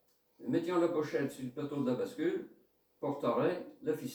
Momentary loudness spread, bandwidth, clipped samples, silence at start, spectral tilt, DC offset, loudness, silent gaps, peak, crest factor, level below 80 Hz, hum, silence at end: 10 LU; over 20 kHz; under 0.1%; 0.4 s; -6.5 dB/octave; under 0.1%; -35 LUFS; none; -20 dBFS; 16 dB; -78 dBFS; none; 0 s